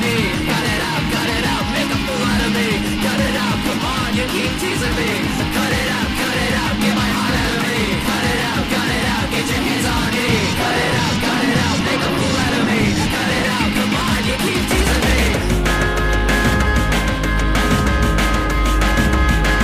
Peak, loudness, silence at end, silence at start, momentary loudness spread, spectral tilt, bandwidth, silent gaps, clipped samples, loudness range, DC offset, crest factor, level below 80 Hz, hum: -4 dBFS; -17 LUFS; 0 s; 0 s; 3 LU; -4.5 dB/octave; 15.5 kHz; none; under 0.1%; 1 LU; under 0.1%; 14 dB; -24 dBFS; none